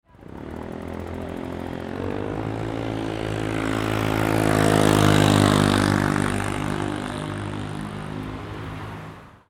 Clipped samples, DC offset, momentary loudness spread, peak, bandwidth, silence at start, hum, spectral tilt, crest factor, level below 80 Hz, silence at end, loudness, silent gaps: under 0.1%; under 0.1%; 17 LU; -2 dBFS; 17 kHz; 0.2 s; none; -5.5 dB/octave; 20 dB; -40 dBFS; 0.2 s; -23 LUFS; none